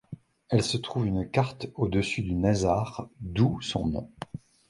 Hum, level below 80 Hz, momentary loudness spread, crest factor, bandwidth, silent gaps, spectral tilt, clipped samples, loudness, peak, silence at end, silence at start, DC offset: none; -46 dBFS; 15 LU; 20 dB; 11.5 kHz; none; -6 dB/octave; under 0.1%; -28 LUFS; -8 dBFS; 0.35 s; 0.1 s; under 0.1%